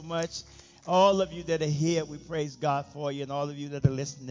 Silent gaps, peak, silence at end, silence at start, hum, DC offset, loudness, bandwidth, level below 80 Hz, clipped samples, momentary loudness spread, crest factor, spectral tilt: none; -10 dBFS; 0 s; 0 s; none; under 0.1%; -29 LUFS; 7.6 kHz; -54 dBFS; under 0.1%; 12 LU; 18 dB; -5.5 dB/octave